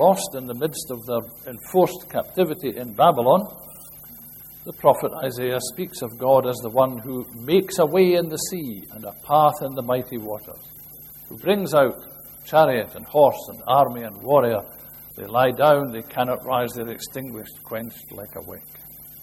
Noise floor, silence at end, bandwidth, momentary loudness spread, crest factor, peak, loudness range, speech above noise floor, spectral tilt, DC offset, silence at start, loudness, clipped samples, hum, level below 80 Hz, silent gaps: -42 dBFS; 0 s; 16.5 kHz; 21 LU; 20 dB; -2 dBFS; 4 LU; 21 dB; -5 dB/octave; under 0.1%; 0 s; -22 LUFS; under 0.1%; none; -58 dBFS; none